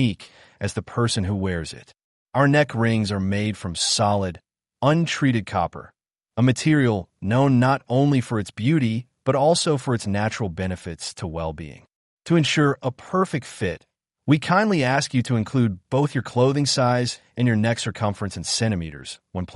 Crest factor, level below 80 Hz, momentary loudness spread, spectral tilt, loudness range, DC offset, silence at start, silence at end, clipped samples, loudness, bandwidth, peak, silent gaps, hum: 16 dB; -54 dBFS; 12 LU; -5.5 dB/octave; 4 LU; under 0.1%; 0 s; 0 s; under 0.1%; -22 LUFS; 11.5 kHz; -6 dBFS; 2.04-2.26 s, 11.96-12.17 s; none